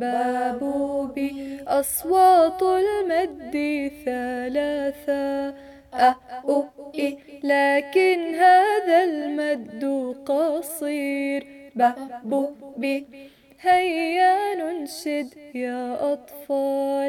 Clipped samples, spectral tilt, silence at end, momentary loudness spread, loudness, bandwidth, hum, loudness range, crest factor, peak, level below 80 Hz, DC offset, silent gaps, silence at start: under 0.1%; -3 dB/octave; 0 s; 12 LU; -23 LUFS; 18 kHz; none; 5 LU; 16 dB; -6 dBFS; -60 dBFS; under 0.1%; none; 0 s